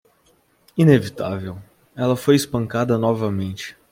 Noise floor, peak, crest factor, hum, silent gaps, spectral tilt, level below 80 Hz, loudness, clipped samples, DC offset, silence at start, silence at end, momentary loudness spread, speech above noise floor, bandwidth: -60 dBFS; -2 dBFS; 18 dB; none; none; -6.5 dB/octave; -56 dBFS; -20 LUFS; under 0.1%; under 0.1%; 0.75 s; 0.2 s; 15 LU; 41 dB; 16.5 kHz